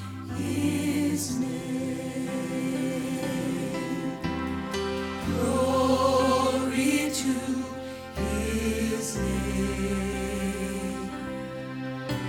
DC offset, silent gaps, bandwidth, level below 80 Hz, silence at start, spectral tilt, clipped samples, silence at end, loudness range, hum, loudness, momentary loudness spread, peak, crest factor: under 0.1%; none; 18 kHz; -42 dBFS; 0 s; -5 dB/octave; under 0.1%; 0 s; 5 LU; none; -28 LUFS; 11 LU; -10 dBFS; 18 dB